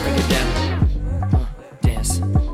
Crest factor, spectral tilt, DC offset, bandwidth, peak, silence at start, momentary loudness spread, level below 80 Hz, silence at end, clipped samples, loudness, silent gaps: 12 dB; -5.5 dB/octave; under 0.1%; 15.5 kHz; -6 dBFS; 0 s; 4 LU; -24 dBFS; 0 s; under 0.1%; -20 LUFS; none